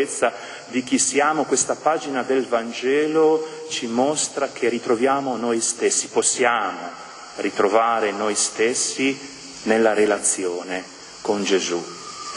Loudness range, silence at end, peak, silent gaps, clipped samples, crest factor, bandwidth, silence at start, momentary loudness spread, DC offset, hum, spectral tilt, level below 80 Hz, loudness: 1 LU; 0 s; -2 dBFS; none; under 0.1%; 20 dB; 11 kHz; 0 s; 12 LU; under 0.1%; none; -2 dB/octave; -66 dBFS; -21 LUFS